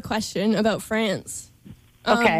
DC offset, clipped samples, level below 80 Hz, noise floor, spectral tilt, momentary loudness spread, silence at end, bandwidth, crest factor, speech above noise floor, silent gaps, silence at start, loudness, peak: under 0.1%; under 0.1%; -54 dBFS; -48 dBFS; -4.5 dB/octave; 12 LU; 0 s; 15.5 kHz; 16 dB; 25 dB; none; 0.05 s; -23 LUFS; -8 dBFS